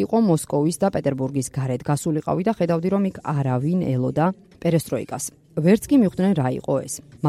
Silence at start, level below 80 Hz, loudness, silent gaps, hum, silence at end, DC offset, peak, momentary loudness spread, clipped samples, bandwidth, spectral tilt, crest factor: 0 s; -54 dBFS; -22 LUFS; none; none; 0 s; under 0.1%; -6 dBFS; 7 LU; under 0.1%; 15 kHz; -7 dB/octave; 16 dB